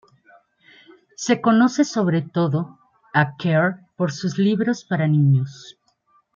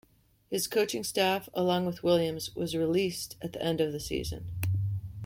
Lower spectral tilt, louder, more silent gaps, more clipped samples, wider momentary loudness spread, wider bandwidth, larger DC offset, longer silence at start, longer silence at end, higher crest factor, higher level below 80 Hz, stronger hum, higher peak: first, -6.5 dB/octave vs -5 dB/octave; first, -20 LUFS vs -30 LUFS; neither; neither; about the same, 9 LU vs 8 LU; second, 7.4 kHz vs 16.5 kHz; neither; first, 1.2 s vs 0.5 s; first, 0.65 s vs 0 s; about the same, 18 dB vs 18 dB; second, -66 dBFS vs -54 dBFS; neither; first, -2 dBFS vs -14 dBFS